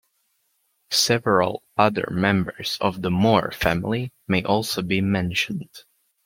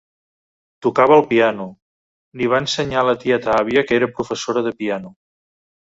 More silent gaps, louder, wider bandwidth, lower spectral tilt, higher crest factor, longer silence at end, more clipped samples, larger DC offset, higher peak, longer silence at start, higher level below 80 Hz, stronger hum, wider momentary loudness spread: second, none vs 1.82-2.32 s; second, -22 LUFS vs -18 LUFS; first, 16.5 kHz vs 8 kHz; about the same, -4.5 dB/octave vs -5 dB/octave; about the same, 20 dB vs 18 dB; second, 0.45 s vs 0.8 s; neither; neither; about the same, -2 dBFS vs -2 dBFS; about the same, 0.9 s vs 0.8 s; about the same, -50 dBFS vs -54 dBFS; neither; second, 8 LU vs 12 LU